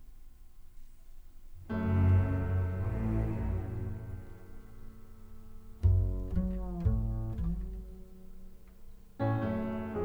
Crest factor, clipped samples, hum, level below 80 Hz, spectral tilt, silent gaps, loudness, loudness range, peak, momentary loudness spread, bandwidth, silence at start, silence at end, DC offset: 18 dB; under 0.1%; none; -40 dBFS; -10 dB/octave; none; -33 LUFS; 4 LU; -16 dBFS; 25 LU; 4.2 kHz; 0 s; 0 s; under 0.1%